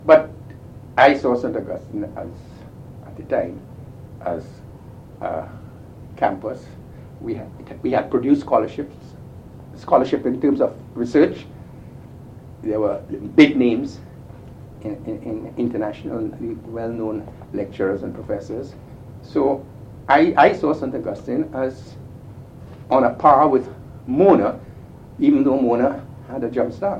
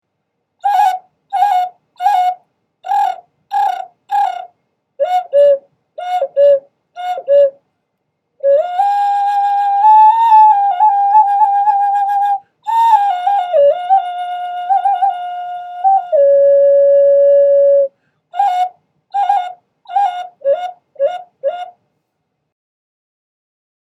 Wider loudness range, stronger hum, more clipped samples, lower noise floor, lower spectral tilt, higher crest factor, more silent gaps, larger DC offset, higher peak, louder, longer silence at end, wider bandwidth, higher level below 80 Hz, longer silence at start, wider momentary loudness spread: about the same, 11 LU vs 9 LU; neither; neither; second, -40 dBFS vs -71 dBFS; first, -7.5 dB/octave vs -1.5 dB/octave; first, 20 dB vs 14 dB; neither; neither; about the same, 0 dBFS vs 0 dBFS; second, -20 LUFS vs -13 LUFS; second, 0 s vs 2.15 s; second, 8.4 kHz vs 13 kHz; first, -50 dBFS vs -82 dBFS; second, 0 s vs 0.65 s; first, 26 LU vs 14 LU